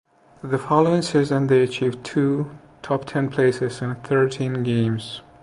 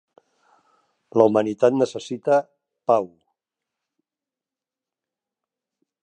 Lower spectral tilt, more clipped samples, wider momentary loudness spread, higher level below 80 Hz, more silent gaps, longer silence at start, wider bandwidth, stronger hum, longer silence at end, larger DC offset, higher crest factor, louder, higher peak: about the same, -7 dB/octave vs -6.5 dB/octave; neither; about the same, 11 LU vs 10 LU; first, -58 dBFS vs -74 dBFS; neither; second, 0.45 s vs 1.15 s; first, 11 kHz vs 9.2 kHz; neither; second, 0.2 s vs 2.95 s; neither; second, 18 dB vs 24 dB; about the same, -21 LUFS vs -21 LUFS; about the same, -2 dBFS vs -2 dBFS